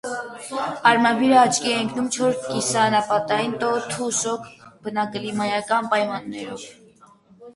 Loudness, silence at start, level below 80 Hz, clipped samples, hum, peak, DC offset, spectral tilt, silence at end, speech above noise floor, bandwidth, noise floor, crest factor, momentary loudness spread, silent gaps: -21 LUFS; 0.05 s; -64 dBFS; under 0.1%; none; 0 dBFS; under 0.1%; -3 dB/octave; 0.05 s; 31 dB; 11.5 kHz; -52 dBFS; 22 dB; 15 LU; none